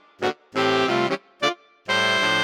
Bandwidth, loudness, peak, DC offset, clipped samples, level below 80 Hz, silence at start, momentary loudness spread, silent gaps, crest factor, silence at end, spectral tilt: 16 kHz; -22 LUFS; -8 dBFS; under 0.1%; under 0.1%; -68 dBFS; 0.2 s; 9 LU; none; 16 dB; 0 s; -3.5 dB/octave